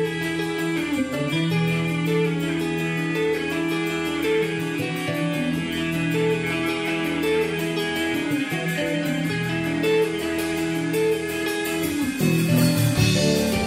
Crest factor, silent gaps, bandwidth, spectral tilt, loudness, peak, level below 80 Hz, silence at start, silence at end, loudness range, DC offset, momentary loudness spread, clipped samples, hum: 16 dB; none; 16 kHz; -5.5 dB/octave; -23 LUFS; -8 dBFS; -48 dBFS; 0 s; 0 s; 2 LU; under 0.1%; 5 LU; under 0.1%; none